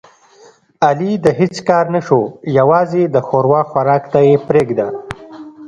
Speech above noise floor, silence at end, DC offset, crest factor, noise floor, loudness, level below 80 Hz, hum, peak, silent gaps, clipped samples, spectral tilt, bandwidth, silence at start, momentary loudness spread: 33 dB; 0 s; under 0.1%; 14 dB; -46 dBFS; -14 LUFS; -52 dBFS; none; 0 dBFS; none; under 0.1%; -7.5 dB/octave; 9.8 kHz; 0.8 s; 9 LU